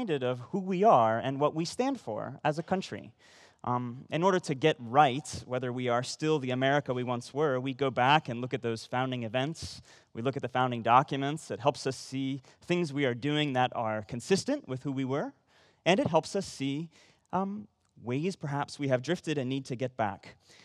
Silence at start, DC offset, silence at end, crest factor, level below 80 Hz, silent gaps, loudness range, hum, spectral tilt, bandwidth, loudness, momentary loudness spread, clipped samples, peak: 0 s; under 0.1%; 0.3 s; 22 dB; -70 dBFS; none; 4 LU; none; -5.5 dB/octave; 12.5 kHz; -30 LUFS; 11 LU; under 0.1%; -8 dBFS